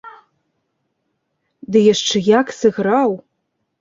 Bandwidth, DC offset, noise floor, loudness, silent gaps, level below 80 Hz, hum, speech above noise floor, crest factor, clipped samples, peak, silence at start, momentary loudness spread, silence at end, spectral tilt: 7.6 kHz; under 0.1%; -72 dBFS; -15 LUFS; none; -60 dBFS; none; 57 dB; 16 dB; under 0.1%; -2 dBFS; 0.05 s; 5 LU; 0.6 s; -4.5 dB/octave